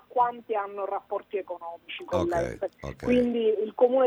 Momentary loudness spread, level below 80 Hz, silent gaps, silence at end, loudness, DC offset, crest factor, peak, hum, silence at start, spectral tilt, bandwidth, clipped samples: 12 LU; -52 dBFS; none; 0 s; -28 LUFS; under 0.1%; 16 dB; -10 dBFS; none; 0.15 s; -6.5 dB/octave; 10 kHz; under 0.1%